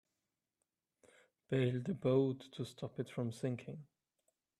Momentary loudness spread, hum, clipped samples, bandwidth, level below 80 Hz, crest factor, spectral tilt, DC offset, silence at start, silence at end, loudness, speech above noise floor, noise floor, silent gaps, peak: 13 LU; none; under 0.1%; 12.5 kHz; -78 dBFS; 20 dB; -7.5 dB/octave; under 0.1%; 1.5 s; 0.75 s; -39 LUFS; 52 dB; -90 dBFS; none; -20 dBFS